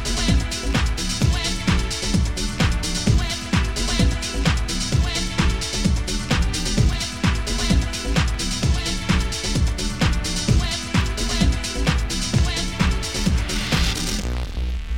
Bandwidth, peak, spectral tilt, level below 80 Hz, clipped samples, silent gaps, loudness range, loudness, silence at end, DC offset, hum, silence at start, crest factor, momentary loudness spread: 16.5 kHz; -4 dBFS; -4 dB/octave; -24 dBFS; under 0.1%; none; 1 LU; -22 LUFS; 0 s; 0.8%; none; 0 s; 16 dB; 3 LU